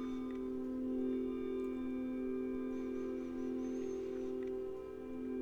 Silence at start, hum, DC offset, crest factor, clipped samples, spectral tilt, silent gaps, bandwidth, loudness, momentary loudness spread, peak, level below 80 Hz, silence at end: 0 s; none; under 0.1%; 12 dB; under 0.1%; -7 dB/octave; none; 7 kHz; -41 LUFS; 4 LU; -28 dBFS; -62 dBFS; 0 s